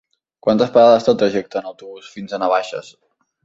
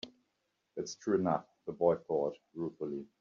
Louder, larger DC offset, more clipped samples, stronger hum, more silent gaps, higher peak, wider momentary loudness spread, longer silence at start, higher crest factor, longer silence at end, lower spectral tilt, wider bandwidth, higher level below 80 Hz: first, -16 LUFS vs -35 LUFS; neither; neither; neither; neither; first, -2 dBFS vs -14 dBFS; first, 22 LU vs 13 LU; first, 0.45 s vs 0.05 s; about the same, 16 dB vs 20 dB; first, 0.65 s vs 0.15 s; about the same, -6 dB/octave vs -6 dB/octave; about the same, 7.8 kHz vs 7.4 kHz; first, -60 dBFS vs -76 dBFS